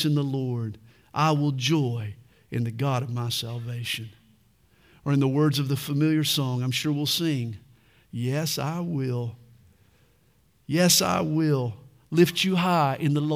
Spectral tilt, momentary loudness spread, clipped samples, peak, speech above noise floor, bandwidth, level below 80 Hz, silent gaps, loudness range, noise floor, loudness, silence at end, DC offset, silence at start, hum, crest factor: -5 dB/octave; 13 LU; under 0.1%; -6 dBFS; 39 dB; 16.5 kHz; -64 dBFS; none; 7 LU; -63 dBFS; -25 LUFS; 0 s; under 0.1%; 0 s; none; 20 dB